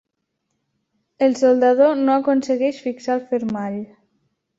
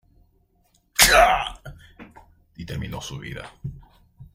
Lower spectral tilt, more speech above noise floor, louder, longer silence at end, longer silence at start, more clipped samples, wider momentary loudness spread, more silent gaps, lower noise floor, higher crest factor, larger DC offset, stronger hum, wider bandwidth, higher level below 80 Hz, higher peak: first, -6 dB/octave vs -1.5 dB/octave; first, 58 dB vs 31 dB; about the same, -19 LUFS vs -18 LUFS; first, 0.75 s vs 0.1 s; first, 1.2 s vs 1 s; neither; second, 12 LU vs 24 LU; neither; first, -75 dBFS vs -64 dBFS; second, 16 dB vs 24 dB; neither; neither; second, 7.8 kHz vs 16 kHz; second, -66 dBFS vs -40 dBFS; second, -4 dBFS vs 0 dBFS